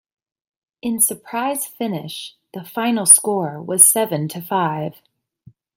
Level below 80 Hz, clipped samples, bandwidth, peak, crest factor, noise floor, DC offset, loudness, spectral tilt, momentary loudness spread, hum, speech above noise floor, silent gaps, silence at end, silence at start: -68 dBFS; under 0.1%; 17 kHz; 0 dBFS; 20 dB; -51 dBFS; under 0.1%; -16 LUFS; -3 dB/octave; 20 LU; none; 32 dB; none; 0.85 s; 0.85 s